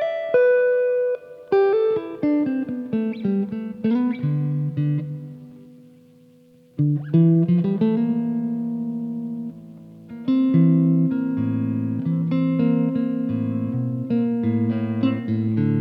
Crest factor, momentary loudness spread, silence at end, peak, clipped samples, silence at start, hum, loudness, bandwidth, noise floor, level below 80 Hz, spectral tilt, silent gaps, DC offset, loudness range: 16 dB; 11 LU; 0 s; -6 dBFS; under 0.1%; 0 s; none; -22 LUFS; 5 kHz; -52 dBFS; -64 dBFS; -11 dB/octave; none; under 0.1%; 4 LU